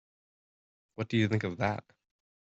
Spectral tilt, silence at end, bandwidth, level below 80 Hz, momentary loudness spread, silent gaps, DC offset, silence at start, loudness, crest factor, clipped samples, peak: -7 dB/octave; 0.6 s; 7.8 kHz; -66 dBFS; 12 LU; none; under 0.1%; 1 s; -32 LUFS; 20 dB; under 0.1%; -14 dBFS